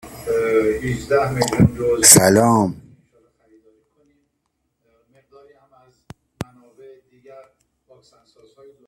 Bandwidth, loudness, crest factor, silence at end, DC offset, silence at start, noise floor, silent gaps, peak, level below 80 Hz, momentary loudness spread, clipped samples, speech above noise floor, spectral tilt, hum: 16 kHz; -15 LUFS; 20 dB; 1.5 s; under 0.1%; 0.05 s; -73 dBFS; none; 0 dBFS; -46 dBFS; 26 LU; under 0.1%; 58 dB; -3.5 dB/octave; none